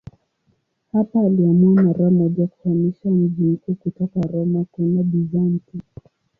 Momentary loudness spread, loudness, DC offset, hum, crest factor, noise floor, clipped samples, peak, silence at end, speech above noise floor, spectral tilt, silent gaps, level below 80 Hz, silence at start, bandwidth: 9 LU; -19 LUFS; under 0.1%; none; 12 dB; -66 dBFS; under 0.1%; -6 dBFS; 0.6 s; 48 dB; -13.5 dB/octave; none; -56 dBFS; 0.95 s; 2.1 kHz